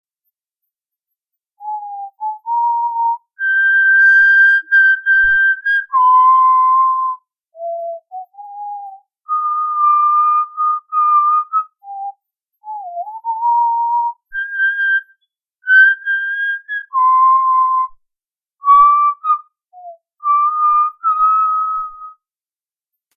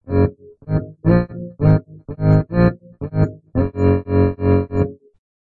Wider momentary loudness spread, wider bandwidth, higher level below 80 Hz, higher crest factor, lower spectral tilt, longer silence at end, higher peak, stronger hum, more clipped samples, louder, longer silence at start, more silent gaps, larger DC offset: first, 19 LU vs 8 LU; first, 6.6 kHz vs 4.5 kHz; second, -58 dBFS vs -36 dBFS; about the same, 14 dB vs 16 dB; second, 0 dB/octave vs -11.5 dB/octave; first, 1.05 s vs 0.6 s; about the same, -2 dBFS vs -2 dBFS; neither; neither; first, -13 LUFS vs -18 LUFS; first, 1.6 s vs 0.05 s; neither; neither